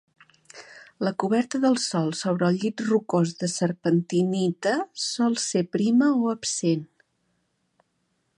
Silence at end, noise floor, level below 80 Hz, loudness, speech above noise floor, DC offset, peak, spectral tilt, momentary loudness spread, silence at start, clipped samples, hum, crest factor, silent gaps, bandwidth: 1.5 s; -73 dBFS; -72 dBFS; -24 LUFS; 49 dB; under 0.1%; -8 dBFS; -5 dB/octave; 5 LU; 0.55 s; under 0.1%; none; 16 dB; none; 11.5 kHz